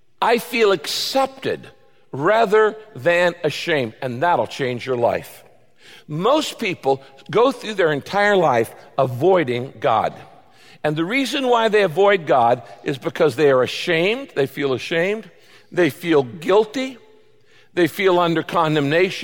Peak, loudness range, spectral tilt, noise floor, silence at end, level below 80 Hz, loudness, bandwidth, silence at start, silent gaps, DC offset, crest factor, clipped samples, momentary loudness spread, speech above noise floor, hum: -4 dBFS; 4 LU; -5 dB/octave; -55 dBFS; 0 s; -62 dBFS; -19 LUFS; 17 kHz; 0.2 s; none; 0.2%; 14 dB; under 0.1%; 10 LU; 36 dB; none